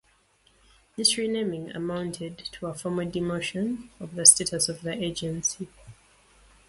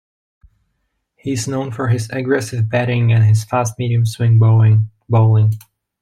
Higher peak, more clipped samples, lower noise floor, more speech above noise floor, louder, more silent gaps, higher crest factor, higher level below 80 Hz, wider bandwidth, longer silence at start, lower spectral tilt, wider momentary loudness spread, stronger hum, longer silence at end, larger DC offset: about the same, 0 dBFS vs -2 dBFS; neither; second, -64 dBFS vs -70 dBFS; second, 37 dB vs 56 dB; second, -24 LUFS vs -16 LUFS; neither; first, 28 dB vs 14 dB; second, -58 dBFS vs -52 dBFS; about the same, 12 kHz vs 13 kHz; second, 0.95 s vs 1.25 s; second, -2.5 dB/octave vs -7 dB/octave; first, 20 LU vs 9 LU; neither; first, 0.75 s vs 0.45 s; neither